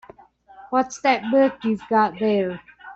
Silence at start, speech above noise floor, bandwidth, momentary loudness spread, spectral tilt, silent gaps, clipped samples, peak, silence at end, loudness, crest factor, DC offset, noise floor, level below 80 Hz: 0.6 s; 28 dB; 8 kHz; 7 LU; -5.5 dB/octave; none; under 0.1%; -6 dBFS; 0 s; -21 LUFS; 16 dB; under 0.1%; -49 dBFS; -62 dBFS